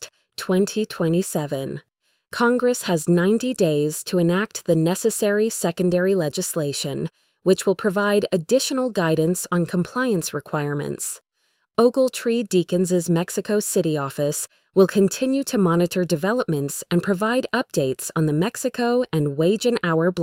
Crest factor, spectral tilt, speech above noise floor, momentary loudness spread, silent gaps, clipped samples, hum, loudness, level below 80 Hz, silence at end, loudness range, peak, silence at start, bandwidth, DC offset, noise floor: 16 dB; -5 dB/octave; 49 dB; 7 LU; none; under 0.1%; none; -21 LUFS; -60 dBFS; 0 s; 2 LU; -6 dBFS; 0 s; 16.5 kHz; under 0.1%; -70 dBFS